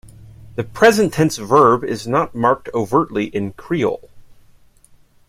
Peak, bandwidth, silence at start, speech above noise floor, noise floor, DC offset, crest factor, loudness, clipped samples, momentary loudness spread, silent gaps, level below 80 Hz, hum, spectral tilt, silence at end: 0 dBFS; 16 kHz; 0.05 s; 34 dB; -50 dBFS; under 0.1%; 18 dB; -17 LUFS; under 0.1%; 14 LU; none; -48 dBFS; none; -5.5 dB/octave; 1.1 s